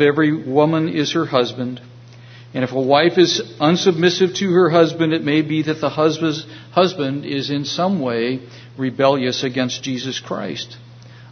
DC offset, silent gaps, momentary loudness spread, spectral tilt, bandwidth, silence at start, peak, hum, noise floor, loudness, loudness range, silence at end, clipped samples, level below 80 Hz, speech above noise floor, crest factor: under 0.1%; none; 11 LU; -5.5 dB/octave; 6.6 kHz; 0 s; 0 dBFS; none; -40 dBFS; -18 LUFS; 5 LU; 0.05 s; under 0.1%; -62 dBFS; 23 dB; 18 dB